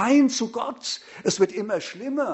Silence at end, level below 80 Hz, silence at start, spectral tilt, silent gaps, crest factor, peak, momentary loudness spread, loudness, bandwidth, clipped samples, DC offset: 0 s; -70 dBFS; 0 s; -4 dB/octave; none; 16 dB; -8 dBFS; 11 LU; -25 LUFS; 8.2 kHz; under 0.1%; under 0.1%